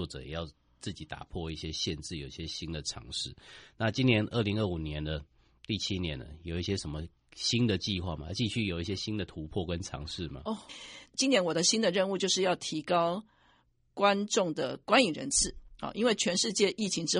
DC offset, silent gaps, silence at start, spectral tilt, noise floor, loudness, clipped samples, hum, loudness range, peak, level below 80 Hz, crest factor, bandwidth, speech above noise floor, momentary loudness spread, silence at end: under 0.1%; none; 0 s; -3.5 dB/octave; -68 dBFS; -31 LUFS; under 0.1%; none; 7 LU; -10 dBFS; -52 dBFS; 22 dB; 11 kHz; 37 dB; 14 LU; 0 s